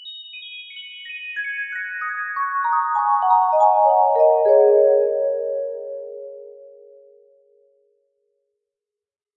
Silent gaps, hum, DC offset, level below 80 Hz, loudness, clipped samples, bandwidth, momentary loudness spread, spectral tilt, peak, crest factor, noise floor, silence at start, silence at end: none; none; under 0.1%; -80 dBFS; -18 LUFS; under 0.1%; 7.2 kHz; 19 LU; -3 dB/octave; -4 dBFS; 16 dB; -89 dBFS; 0 s; 2.7 s